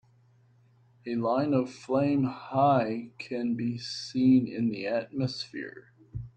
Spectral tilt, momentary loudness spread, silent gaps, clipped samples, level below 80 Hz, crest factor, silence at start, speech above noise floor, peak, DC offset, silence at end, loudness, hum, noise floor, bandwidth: -7 dB/octave; 14 LU; none; under 0.1%; -62 dBFS; 16 dB; 1.05 s; 34 dB; -12 dBFS; under 0.1%; 0.05 s; -28 LUFS; none; -62 dBFS; 8.8 kHz